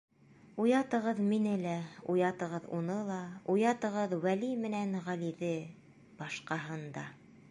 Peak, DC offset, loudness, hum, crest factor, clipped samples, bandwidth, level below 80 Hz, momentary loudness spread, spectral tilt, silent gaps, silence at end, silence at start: -18 dBFS; under 0.1%; -34 LUFS; none; 16 dB; under 0.1%; 11.5 kHz; -78 dBFS; 12 LU; -6.5 dB/octave; none; 0.1 s; 0.45 s